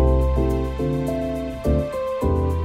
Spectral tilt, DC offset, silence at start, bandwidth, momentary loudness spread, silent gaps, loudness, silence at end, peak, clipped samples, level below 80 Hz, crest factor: -8.5 dB/octave; under 0.1%; 0 s; 13.5 kHz; 5 LU; none; -23 LUFS; 0 s; -8 dBFS; under 0.1%; -24 dBFS; 14 dB